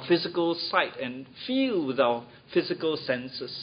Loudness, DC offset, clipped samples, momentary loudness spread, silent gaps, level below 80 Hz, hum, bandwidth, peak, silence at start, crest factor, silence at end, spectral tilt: -28 LUFS; under 0.1%; under 0.1%; 10 LU; none; -70 dBFS; none; 5.2 kHz; -8 dBFS; 0 s; 20 dB; 0 s; -9 dB/octave